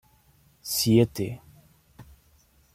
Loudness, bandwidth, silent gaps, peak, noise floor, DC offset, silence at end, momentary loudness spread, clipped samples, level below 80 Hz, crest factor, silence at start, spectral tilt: -24 LUFS; 16.5 kHz; none; -8 dBFS; -61 dBFS; under 0.1%; 0.75 s; 21 LU; under 0.1%; -56 dBFS; 20 dB; 0.65 s; -5 dB/octave